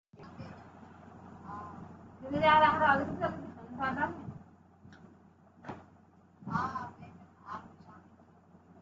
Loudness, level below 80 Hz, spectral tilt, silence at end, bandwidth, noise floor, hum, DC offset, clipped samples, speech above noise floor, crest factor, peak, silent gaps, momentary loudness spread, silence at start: -30 LUFS; -68 dBFS; -3 dB/octave; 0.8 s; 7.6 kHz; -61 dBFS; none; under 0.1%; under 0.1%; 33 dB; 22 dB; -14 dBFS; none; 28 LU; 0.2 s